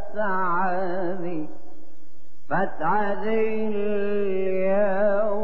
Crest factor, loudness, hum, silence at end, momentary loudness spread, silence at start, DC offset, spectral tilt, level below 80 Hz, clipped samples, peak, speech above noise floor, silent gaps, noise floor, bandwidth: 12 dB; -25 LUFS; none; 0 s; 7 LU; 0 s; 7%; -9 dB/octave; -64 dBFS; under 0.1%; -10 dBFS; 33 dB; none; -58 dBFS; 5.8 kHz